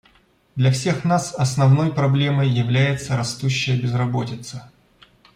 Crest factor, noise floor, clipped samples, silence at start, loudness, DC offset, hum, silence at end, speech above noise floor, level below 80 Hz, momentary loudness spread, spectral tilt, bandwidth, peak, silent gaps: 14 dB; -57 dBFS; under 0.1%; 0.55 s; -20 LUFS; under 0.1%; none; 0.7 s; 38 dB; -54 dBFS; 12 LU; -6 dB/octave; 11 kHz; -6 dBFS; none